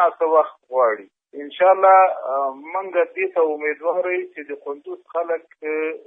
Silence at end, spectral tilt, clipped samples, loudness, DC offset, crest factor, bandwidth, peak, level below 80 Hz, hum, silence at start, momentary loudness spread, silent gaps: 0.1 s; -6.5 dB/octave; under 0.1%; -20 LUFS; under 0.1%; 18 dB; 3.8 kHz; -2 dBFS; -86 dBFS; none; 0 s; 18 LU; none